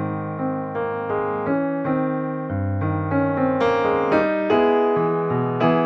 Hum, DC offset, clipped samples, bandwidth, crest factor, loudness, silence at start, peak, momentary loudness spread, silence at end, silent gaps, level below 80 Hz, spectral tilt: none; under 0.1%; under 0.1%; 6.6 kHz; 14 dB; -21 LUFS; 0 s; -6 dBFS; 7 LU; 0 s; none; -56 dBFS; -9 dB/octave